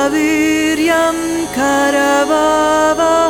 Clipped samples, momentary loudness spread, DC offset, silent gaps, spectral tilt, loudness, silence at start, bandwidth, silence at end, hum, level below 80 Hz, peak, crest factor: under 0.1%; 4 LU; under 0.1%; none; -3 dB/octave; -13 LUFS; 0 s; 17.5 kHz; 0 s; none; -42 dBFS; -2 dBFS; 12 dB